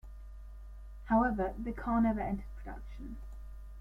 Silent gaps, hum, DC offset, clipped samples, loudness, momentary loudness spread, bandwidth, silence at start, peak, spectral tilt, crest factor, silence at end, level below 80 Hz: none; none; under 0.1%; under 0.1%; -33 LUFS; 22 LU; 5.2 kHz; 0.05 s; -18 dBFS; -9 dB/octave; 18 dB; 0 s; -44 dBFS